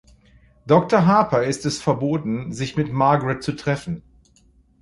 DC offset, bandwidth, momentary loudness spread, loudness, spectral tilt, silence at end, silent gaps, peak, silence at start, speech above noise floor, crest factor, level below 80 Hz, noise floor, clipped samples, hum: under 0.1%; 11.5 kHz; 10 LU; -20 LUFS; -6.5 dB/octave; 0.8 s; none; -2 dBFS; 0.65 s; 37 dB; 18 dB; -50 dBFS; -56 dBFS; under 0.1%; none